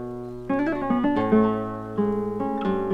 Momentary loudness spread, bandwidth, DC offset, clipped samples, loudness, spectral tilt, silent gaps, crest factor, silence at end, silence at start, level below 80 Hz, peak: 9 LU; 5.6 kHz; under 0.1%; under 0.1%; -24 LUFS; -9 dB/octave; none; 18 dB; 0 s; 0 s; -50 dBFS; -6 dBFS